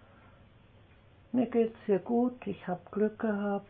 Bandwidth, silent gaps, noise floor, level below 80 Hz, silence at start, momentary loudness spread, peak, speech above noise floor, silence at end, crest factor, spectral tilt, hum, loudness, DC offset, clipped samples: 3.7 kHz; none; -59 dBFS; -66 dBFS; 1.35 s; 9 LU; -16 dBFS; 28 dB; 0.05 s; 16 dB; -11 dB/octave; none; -32 LUFS; under 0.1%; under 0.1%